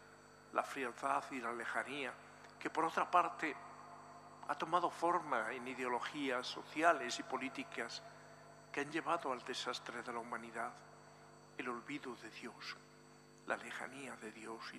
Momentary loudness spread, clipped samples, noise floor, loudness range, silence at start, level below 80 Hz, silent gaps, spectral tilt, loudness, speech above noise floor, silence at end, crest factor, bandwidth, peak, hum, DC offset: 22 LU; under 0.1%; -62 dBFS; 9 LU; 0 s; -82 dBFS; none; -3.5 dB/octave; -41 LUFS; 21 dB; 0 s; 26 dB; 15 kHz; -16 dBFS; 50 Hz at -70 dBFS; under 0.1%